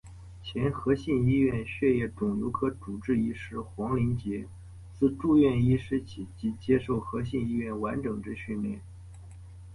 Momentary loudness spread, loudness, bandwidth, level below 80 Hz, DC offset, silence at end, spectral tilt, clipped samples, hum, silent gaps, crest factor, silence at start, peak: 21 LU; -29 LUFS; 11.5 kHz; -48 dBFS; under 0.1%; 0 s; -8.5 dB/octave; under 0.1%; none; none; 16 dB; 0.05 s; -12 dBFS